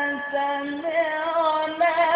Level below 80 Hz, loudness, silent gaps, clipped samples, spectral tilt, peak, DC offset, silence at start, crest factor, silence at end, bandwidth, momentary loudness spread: -68 dBFS; -24 LUFS; none; under 0.1%; -7.5 dB/octave; -10 dBFS; under 0.1%; 0 s; 14 dB; 0 s; 5 kHz; 4 LU